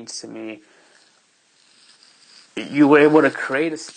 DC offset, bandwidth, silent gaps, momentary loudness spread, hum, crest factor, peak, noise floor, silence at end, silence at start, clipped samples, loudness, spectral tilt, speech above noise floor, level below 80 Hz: under 0.1%; 9.6 kHz; none; 22 LU; none; 18 dB; -2 dBFS; -59 dBFS; 0.05 s; 0 s; under 0.1%; -16 LUFS; -5.5 dB/octave; 41 dB; -70 dBFS